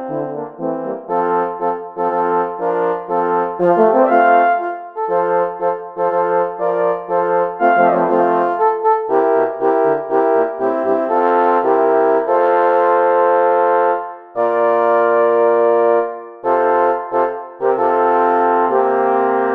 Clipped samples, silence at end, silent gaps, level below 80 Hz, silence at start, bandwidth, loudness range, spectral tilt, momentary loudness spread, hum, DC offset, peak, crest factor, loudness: under 0.1%; 0 s; none; -70 dBFS; 0 s; 4.7 kHz; 3 LU; -8.5 dB/octave; 8 LU; none; under 0.1%; 0 dBFS; 14 dB; -15 LUFS